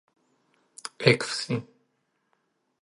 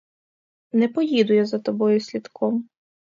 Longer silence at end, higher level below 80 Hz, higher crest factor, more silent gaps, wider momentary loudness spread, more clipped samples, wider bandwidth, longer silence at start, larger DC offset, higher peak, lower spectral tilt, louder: first, 1.2 s vs 0.45 s; first, -68 dBFS vs -74 dBFS; first, 28 dB vs 16 dB; neither; first, 19 LU vs 8 LU; neither; first, 11.5 kHz vs 7.4 kHz; about the same, 0.85 s vs 0.75 s; neither; first, -2 dBFS vs -6 dBFS; second, -4.5 dB/octave vs -6.5 dB/octave; second, -25 LUFS vs -22 LUFS